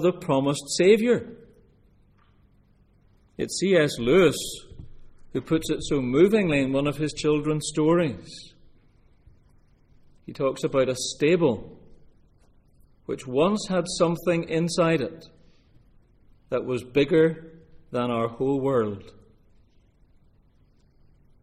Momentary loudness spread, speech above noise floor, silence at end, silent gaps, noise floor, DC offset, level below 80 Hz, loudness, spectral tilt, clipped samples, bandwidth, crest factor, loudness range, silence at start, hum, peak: 15 LU; 36 dB; 2.3 s; none; -60 dBFS; under 0.1%; -52 dBFS; -24 LUFS; -5.5 dB/octave; under 0.1%; 14.5 kHz; 20 dB; 6 LU; 0 s; none; -6 dBFS